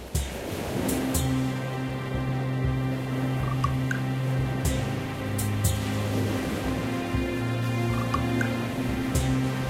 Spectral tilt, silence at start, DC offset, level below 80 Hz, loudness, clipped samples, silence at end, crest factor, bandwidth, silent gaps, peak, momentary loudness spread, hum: -6 dB/octave; 0 s; under 0.1%; -38 dBFS; -28 LUFS; under 0.1%; 0 s; 16 dB; 16 kHz; none; -12 dBFS; 4 LU; none